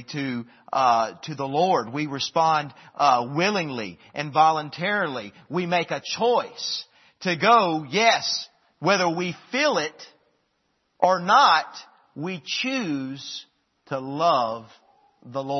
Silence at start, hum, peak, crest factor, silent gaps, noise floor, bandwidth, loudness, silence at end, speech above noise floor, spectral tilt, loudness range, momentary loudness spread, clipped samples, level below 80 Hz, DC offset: 0 s; none; -2 dBFS; 22 dB; none; -72 dBFS; 6.4 kHz; -23 LUFS; 0 s; 48 dB; -4 dB/octave; 3 LU; 15 LU; under 0.1%; -74 dBFS; under 0.1%